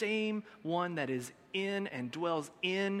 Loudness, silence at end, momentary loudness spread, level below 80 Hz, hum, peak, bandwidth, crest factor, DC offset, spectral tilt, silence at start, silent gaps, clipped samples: -36 LUFS; 0 s; 6 LU; -80 dBFS; none; -18 dBFS; 15.5 kHz; 18 dB; under 0.1%; -5 dB/octave; 0 s; none; under 0.1%